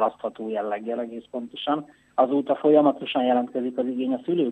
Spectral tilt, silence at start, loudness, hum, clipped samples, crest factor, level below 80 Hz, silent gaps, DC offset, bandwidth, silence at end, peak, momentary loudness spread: -7.5 dB/octave; 0 s; -24 LUFS; none; under 0.1%; 18 dB; -74 dBFS; none; under 0.1%; 8.4 kHz; 0 s; -6 dBFS; 12 LU